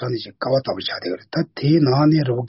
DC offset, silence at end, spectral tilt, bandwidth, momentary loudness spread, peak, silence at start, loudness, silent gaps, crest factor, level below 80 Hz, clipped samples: under 0.1%; 0 s; -6 dB/octave; 6 kHz; 11 LU; -6 dBFS; 0 s; -20 LUFS; none; 14 dB; -54 dBFS; under 0.1%